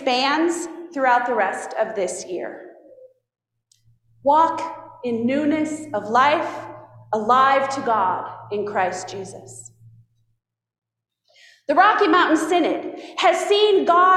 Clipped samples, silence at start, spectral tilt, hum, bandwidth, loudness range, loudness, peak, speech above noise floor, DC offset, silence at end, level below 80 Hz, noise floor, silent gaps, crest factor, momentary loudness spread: under 0.1%; 0 s; -3.5 dB/octave; none; 13 kHz; 7 LU; -20 LUFS; -4 dBFS; 43 dB; under 0.1%; 0 s; -68 dBFS; -62 dBFS; 10.78-10.82 s; 18 dB; 17 LU